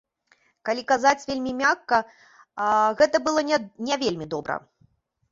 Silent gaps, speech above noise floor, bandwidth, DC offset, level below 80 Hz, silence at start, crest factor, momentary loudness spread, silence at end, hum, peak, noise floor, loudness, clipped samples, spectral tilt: none; 41 dB; 7.8 kHz; under 0.1%; -62 dBFS; 0.65 s; 20 dB; 12 LU; 0.75 s; none; -4 dBFS; -64 dBFS; -23 LUFS; under 0.1%; -3.5 dB/octave